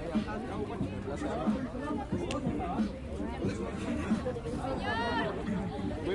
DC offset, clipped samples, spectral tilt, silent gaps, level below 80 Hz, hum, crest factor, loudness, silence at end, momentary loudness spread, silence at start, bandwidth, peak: under 0.1%; under 0.1%; -6.5 dB/octave; none; -46 dBFS; none; 14 dB; -35 LUFS; 0 s; 4 LU; 0 s; 11.5 kHz; -20 dBFS